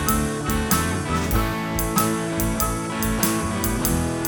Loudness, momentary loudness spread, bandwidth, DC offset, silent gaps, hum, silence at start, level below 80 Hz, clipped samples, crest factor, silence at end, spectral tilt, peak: -22 LUFS; 3 LU; over 20 kHz; under 0.1%; none; none; 0 s; -32 dBFS; under 0.1%; 20 dB; 0 s; -4.5 dB/octave; -2 dBFS